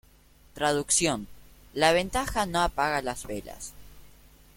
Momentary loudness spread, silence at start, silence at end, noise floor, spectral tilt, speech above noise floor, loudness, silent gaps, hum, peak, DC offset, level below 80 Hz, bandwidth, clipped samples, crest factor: 17 LU; 0.55 s; 0.5 s; -57 dBFS; -2.5 dB/octave; 30 dB; -27 LUFS; none; none; -6 dBFS; under 0.1%; -46 dBFS; 16.5 kHz; under 0.1%; 22 dB